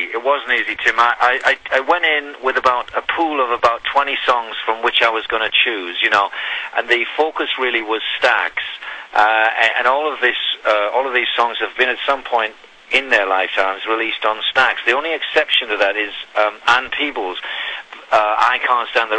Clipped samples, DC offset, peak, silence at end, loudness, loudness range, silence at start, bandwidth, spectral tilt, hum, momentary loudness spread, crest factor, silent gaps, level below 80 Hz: under 0.1%; under 0.1%; -2 dBFS; 0 s; -16 LUFS; 1 LU; 0 s; 9.8 kHz; -1.5 dB/octave; none; 6 LU; 16 dB; none; -56 dBFS